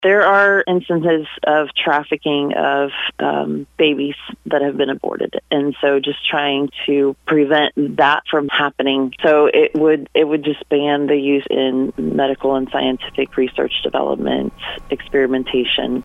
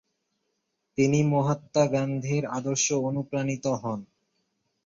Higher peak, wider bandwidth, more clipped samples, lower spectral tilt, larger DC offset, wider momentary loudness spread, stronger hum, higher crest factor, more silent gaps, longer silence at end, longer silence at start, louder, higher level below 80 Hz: first, -2 dBFS vs -10 dBFS; second, 6.8 kHz vs 7.6 kHz; neither; about the same, -6.5 dB/octave vs -5.5 dB/octave; neither; about the same, 7 LU vs 8 LU; neither; about the same, 16 dB vs 18 dB; neither; second, 0 s vs 0.8 s; second, 0 s vs 1 s; first, -17 LUFS vs -26 LUFS; first, -48 dBFS vs -66 dBFS